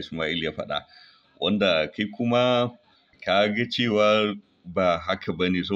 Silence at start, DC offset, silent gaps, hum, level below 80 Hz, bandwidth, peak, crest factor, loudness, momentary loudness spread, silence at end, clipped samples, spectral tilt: 0 s; under 0.1%; none; none; -58 dBFS; 7.8 kHz; -8 dBFS; 16 dB; -24 LUFS; 10 LU; 0 s; under 0.1%; -6 dB/octave